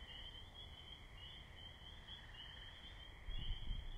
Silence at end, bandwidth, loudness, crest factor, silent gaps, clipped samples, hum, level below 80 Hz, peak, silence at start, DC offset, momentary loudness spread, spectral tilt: 0 s; 12 kHz; -54 LUFS; 18 dB; none; under 0.1%; none; -52 dBFS; -32 dBFS; 0 s; under 0.1%; 6 LU; -4.5 dB/octave